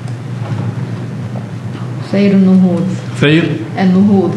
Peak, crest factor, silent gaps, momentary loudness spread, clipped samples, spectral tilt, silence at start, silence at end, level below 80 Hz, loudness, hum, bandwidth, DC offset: 0 dBFS; 12 dB; none; 14 LU; under 0.1%; -8 dB/octave; 0 s; 0 s; -54 dBFS; -13 LUFS; none; 9.4 kHz; under 0.1%